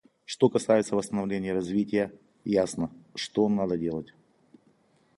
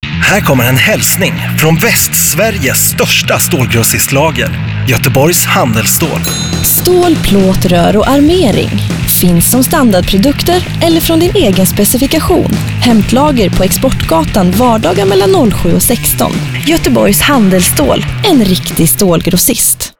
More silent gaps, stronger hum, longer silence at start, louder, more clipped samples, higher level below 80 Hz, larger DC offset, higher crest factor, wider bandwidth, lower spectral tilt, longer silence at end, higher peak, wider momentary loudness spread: neither; neither; first, 0.3 s vs 0 s; second, -28 LUFS vs -8 LUFS; neither; second, -62 dBFS vs -24 dBFS; second, under 0.1% vs 2%; first, 20 dB vs 8 dB; second, 11.5 kHz vs over 20 kHz; first, -6 dB/octave vs -4 dB/octave; first, 1.1 s vs 0.1 s; second, -8 dBFS vs 0 dBFS; first, 12 LU vs 4 LU